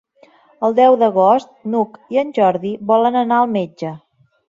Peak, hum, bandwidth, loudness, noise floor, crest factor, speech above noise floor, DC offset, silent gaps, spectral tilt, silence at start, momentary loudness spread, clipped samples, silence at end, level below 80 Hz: -2 dBFS; none; 7.4 kHz; -16 LUFS; -51 dBFS; 14 dB; 35 dB; under 0.1%; none; -7.5 dB/octave; 0.6 s; 10 LU; under 0.1%; 0.55 s; -64 dBFS